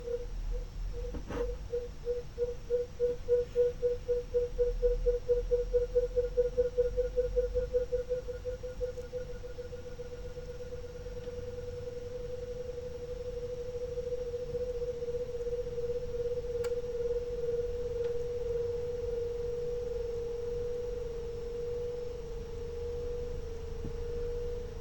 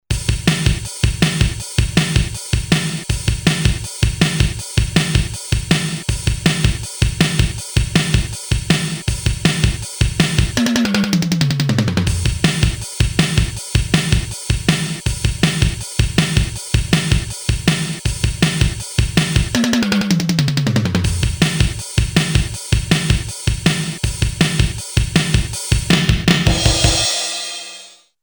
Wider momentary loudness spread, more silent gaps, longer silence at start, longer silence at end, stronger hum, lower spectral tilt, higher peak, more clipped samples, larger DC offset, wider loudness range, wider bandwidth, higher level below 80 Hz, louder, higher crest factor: first, 11 LU vs 5 LU; neither; about the same, 0 s vs 0.1 s; second, 0 s vs 0.35 s; neither; first, -6.5 dB/octave vs -4.5 dB/octave; second, -18 dBFS vs 0 dBFS; neither; neither; first, 10 LU vs 2 LU; second, 17 kHz vs over 20 kHz; second, -42 dBFS vs -24 dBFS; second, -36 LUFS vs -17 LUFS; about the same, 16 dB vs 16 dB